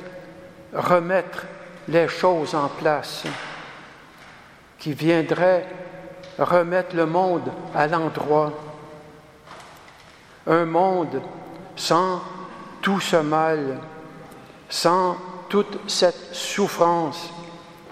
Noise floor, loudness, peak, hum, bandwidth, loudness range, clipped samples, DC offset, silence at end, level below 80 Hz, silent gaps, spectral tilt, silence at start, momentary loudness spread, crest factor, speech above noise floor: -48 dBFS; -22 LUFS; -2 dBFS; none; 15 kHz; 3 LU; under 0.1%; under 0.1%; 0 s; -64 dBFS; none; -5 dB/octave; 0 s; 20 LU; 22 dB; 26 dB